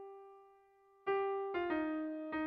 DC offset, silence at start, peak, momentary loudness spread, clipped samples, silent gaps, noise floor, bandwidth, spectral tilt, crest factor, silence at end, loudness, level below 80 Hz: under 0.1%; 0 s; -24 dBFS; 18 LU; under 0.1%; none; -67 dBFS; 5 kHz; -7.5 dB/octave; 14 dB; 0 s; -38 LUFS; -74 dBFS